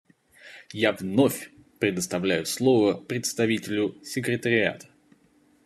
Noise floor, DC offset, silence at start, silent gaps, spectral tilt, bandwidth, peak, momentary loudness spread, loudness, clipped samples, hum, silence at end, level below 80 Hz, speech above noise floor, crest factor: -62 dBFS; under 0.1%; 0.45 s; none; -4.5 dB/octave; 14 kHz; -6 dBFS; 8 LU; -25 LUFS; under 0.1%; none; 0.85 s; -68 dBFS; 37 dB; 20 dB